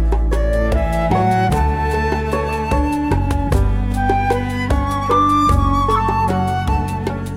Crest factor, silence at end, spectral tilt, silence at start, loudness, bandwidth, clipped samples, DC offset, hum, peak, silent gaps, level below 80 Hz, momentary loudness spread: 14 dB; 0 s; -7 dB/octave; 0 s; -17 LUFS; 15.5 kHz; under 0.1%; under 0.1%; none; -4 dBFS; none; -22 dBFS; 5 LU